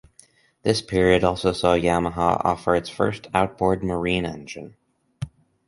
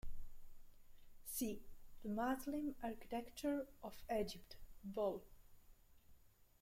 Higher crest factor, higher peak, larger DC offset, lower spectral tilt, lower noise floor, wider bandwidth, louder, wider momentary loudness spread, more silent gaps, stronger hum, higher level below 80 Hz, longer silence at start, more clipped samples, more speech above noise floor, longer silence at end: about the same, 20 dB vs 18 dB; first, -2 dBFS vs -28 dBFS; neither; about the same, -5.5 dB/octave vs -4.5 dB/octave; second, -56 dBFS vs -67 dBFS; second, 11.5 kHz vs 16.5 kHz; first, -22 LUFS vs -46 LUFS; first, 18 LU vs 15 LU; neither; neither; first, -44 dBFS vs -60 dBFS; first, 0.65 s vs 0.05 s; neither; first, 34 dB vs 23 dB; first, 0.4 s vs 0.15 s